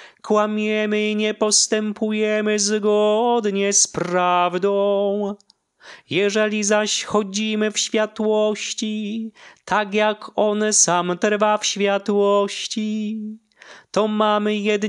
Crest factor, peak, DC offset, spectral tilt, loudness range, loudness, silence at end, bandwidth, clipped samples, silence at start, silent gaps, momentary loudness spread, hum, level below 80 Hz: 16 dB; -4 dBFS; under 0.1%; -3 dB/octave; 3 LU; -19 LUFS; 0 s; 11.5 kHz; under 0.1%; 0 s; none; 9 LU; none; -68 dBFS